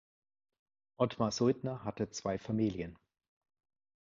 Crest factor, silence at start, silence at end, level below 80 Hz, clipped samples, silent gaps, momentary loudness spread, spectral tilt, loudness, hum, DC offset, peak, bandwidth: 22 dB; 1 s; 1.1 s; -64 dBFS; under 0.1%; none; 8 LU; -6.5 dB/octave; -35 LUFS; none; under 0.1%; -16 dBFS; 7.4 kHz